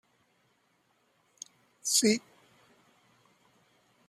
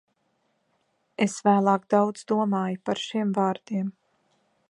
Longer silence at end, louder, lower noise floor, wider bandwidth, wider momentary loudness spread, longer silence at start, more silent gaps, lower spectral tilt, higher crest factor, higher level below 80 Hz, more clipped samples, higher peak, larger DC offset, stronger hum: first, 1.9 s vs 0.8 s; about the same, -27 LUFS vs -25 LUFS; about the same, -72 dBFS vs -72 dBFS; first, 15 kHz vs 11 kHz; first, 24 LU vs 9 LU; first, 1.85 s vs 1.2 s; neither; second, -2 dB/octave vs -6 dB/octave; about the same, 24 dB vs 20 dB; about the same, -80 dBFS vs -76 dBFS; neither; second, -12 dBFS vs -8 dBFS; neither; neither